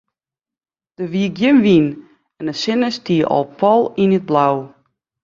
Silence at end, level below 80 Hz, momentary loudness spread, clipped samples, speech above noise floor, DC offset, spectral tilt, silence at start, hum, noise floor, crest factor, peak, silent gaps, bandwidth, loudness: 0.55 s; -58 dBFS; 12 LU; under 0.1%; over 75 dB; under 0.1%; -7 dB/octave; 1 s; none; under -90 dBFS; 16 dB; -2 dBFS; none; 7.4 kHz; -16 LUFS